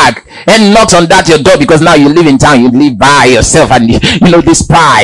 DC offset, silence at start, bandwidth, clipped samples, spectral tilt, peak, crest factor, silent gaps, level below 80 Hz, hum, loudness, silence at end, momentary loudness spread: under 0.1%; 0 s; 12 kHz; 20%; -4.5 dB/octave; 0 dBFS; 4 dB; none; -26 dBFS; none; -4 LUFS; 0 s; 3 LU